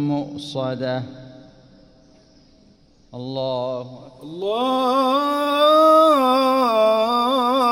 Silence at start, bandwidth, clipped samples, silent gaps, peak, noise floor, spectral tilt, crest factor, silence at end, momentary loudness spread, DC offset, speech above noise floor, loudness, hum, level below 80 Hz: 0 s; 16.5 kHz; under 0.1%; none; -4 dBFS; -53 dBFS; -5.5 dB/octave; 16 dB; 0 s; 18 LU; under 0.1%; 35 dB; -18 LUFS; none; -60 dBFS